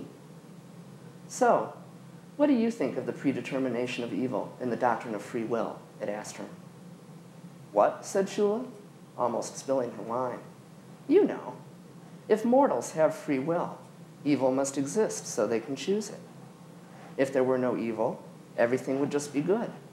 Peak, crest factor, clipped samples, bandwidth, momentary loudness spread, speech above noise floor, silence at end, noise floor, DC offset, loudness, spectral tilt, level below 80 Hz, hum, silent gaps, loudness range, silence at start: -10 dBFS; 20 dB; under 0.1%; 15.5 kHz; 24 LU; 21 dB; 0 s; -49 dBFS; under 0.1%; -29 LUFS; -5.5 dB/octave; -82 dBFS; none; none; 4 LU; 0 s